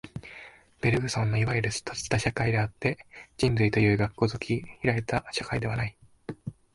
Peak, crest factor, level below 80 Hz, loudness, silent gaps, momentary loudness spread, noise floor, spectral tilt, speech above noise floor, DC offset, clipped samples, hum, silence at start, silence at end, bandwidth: -8 dBFS; 20 dB; -48 dBFS; -28 LUFS; none; 18 LU; -50 dBFS; -5.5 dB/octave; 23 dB; under 0.1%; under 0.1%; none; 0.05 s; 0.2 s; 11.5 kHz